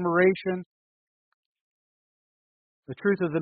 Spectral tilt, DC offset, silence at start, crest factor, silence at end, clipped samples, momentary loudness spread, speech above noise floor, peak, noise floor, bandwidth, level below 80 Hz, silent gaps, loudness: -6 dB/octave; under 0.1%; 0 s; 20 dB; 0 s; under 0.1%; 13 LU; over 65 dB; -10 dBFS; under -90 dBFS; 4.6 kHz; -68 dBFS; 0.66-1.55 s, 1.61-2.83 s; -26 LUFS